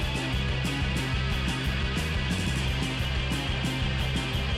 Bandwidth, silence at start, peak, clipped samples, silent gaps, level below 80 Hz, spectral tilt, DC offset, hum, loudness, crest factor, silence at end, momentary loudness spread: 15.5 kHz; 0 s; -18 dBFS; under 0.1%; none; -32 dBFS; -5 dB/octave; under 0.1%; none; -28 LUFS; 10 dB; 0 s; 1 LU